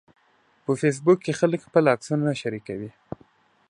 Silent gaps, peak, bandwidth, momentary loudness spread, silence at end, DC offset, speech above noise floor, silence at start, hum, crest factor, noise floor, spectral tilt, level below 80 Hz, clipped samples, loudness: none; -4 dBFS; 11 kHz; 18 LU; 0.8 s; under 0.1%; 40 dB; 0.7 s; none; 20 dB; -63 dBFS; -6.5 dB/octave; -66 dBFS; under 0.1%; -23 LUFS